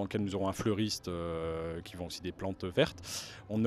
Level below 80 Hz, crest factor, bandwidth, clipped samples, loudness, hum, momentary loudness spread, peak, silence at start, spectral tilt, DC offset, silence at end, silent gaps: -56 dBFS; 22 dB; 14.5 kHz; under 0.1%; -36 LUFS; none; 9 LU; -12 dBFS; 0 s; -5 dB/octave; under 0.1%; 0 s; none